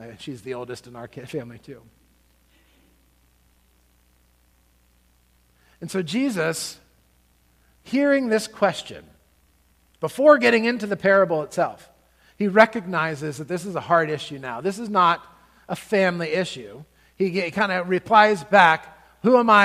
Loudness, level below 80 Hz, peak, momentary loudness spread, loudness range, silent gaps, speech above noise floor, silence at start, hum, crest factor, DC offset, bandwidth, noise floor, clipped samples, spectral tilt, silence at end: -21 LUFS; -62 dBFS; 0 dBFS; 18 LU; 18 LU; none; 40 dB; 0 s; none; 22 dB; under 0.1%; 15.5 kHz; -61 dBFS; under 0.1%; -5 dB/octave; 0 s